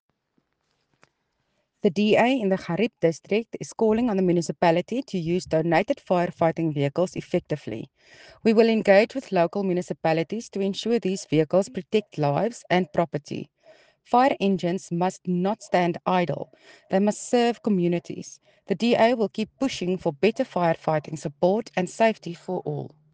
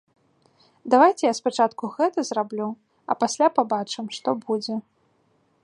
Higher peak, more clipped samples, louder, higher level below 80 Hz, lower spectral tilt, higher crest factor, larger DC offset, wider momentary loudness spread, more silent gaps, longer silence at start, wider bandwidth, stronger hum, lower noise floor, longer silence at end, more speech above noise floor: about the same, -4 dBFS vs -4 dBFS; neither; about the same, -24 LUFS vs -23 LUFS; first, -62 dBFS vs -78 dBFS; first, -6 dB/octave vs -4 dB/octave; about the same, 20 dB vs 20 dB; neither; second, 11 LU vs 14 LU; neither; first, 1.85 s vs 0.85 s; second, 9.6 kHz vs 11 kHz; neither; first, -74 dBFS vs -65 dBFS; second, 0.25 s vs 0.85 s; first, 50 dB vs 43 dB